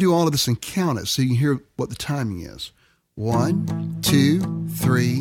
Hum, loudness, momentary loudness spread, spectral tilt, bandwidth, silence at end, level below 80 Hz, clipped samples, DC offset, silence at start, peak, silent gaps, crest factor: none; -22 LUFS; 12 LU; -5.5 dB/octave; 18.5 kHz; 0 s; -50 dBFS; under 0.1%; under 0.1%; 0 s; -4 dBFS; none; 18 dB